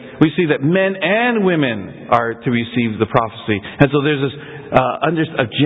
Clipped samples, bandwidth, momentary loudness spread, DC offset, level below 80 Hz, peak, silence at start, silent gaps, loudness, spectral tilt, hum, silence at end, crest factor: under 0.1%; 5.2 kHz; 6 LU; under 0.1%; -46 dBFS; 0 dBFS; 0 s; none; -17 LUFS; -9 dB/octave; none; 0 s; 16 dB